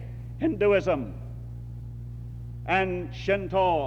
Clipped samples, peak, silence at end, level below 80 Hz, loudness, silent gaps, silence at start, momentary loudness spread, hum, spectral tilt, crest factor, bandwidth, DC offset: under 0.1%; -12 dBFS; 0 s; -44 dBFS; -26 LUFS; none; 0 s; 16 LU; none; -7.5 dB/octave; 16 dB; 8 kHz; under 0.1%